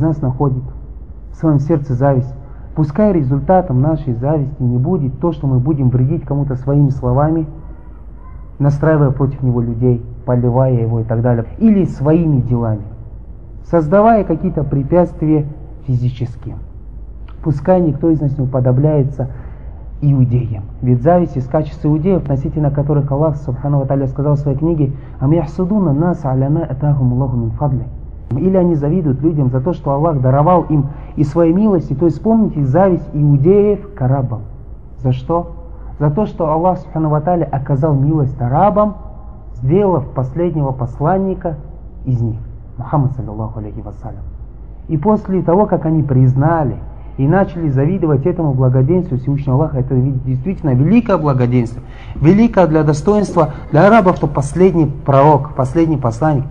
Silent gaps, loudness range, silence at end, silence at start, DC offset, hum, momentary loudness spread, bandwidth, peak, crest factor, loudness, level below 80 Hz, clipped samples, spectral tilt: none; 5 LU; 0 s; 0 s; 1%; none; 15 LU; 9 kHz; 0 dBFS; 14 dB; -15 LUFS; -32 dBFS; under 0.1%; -10 dB/octave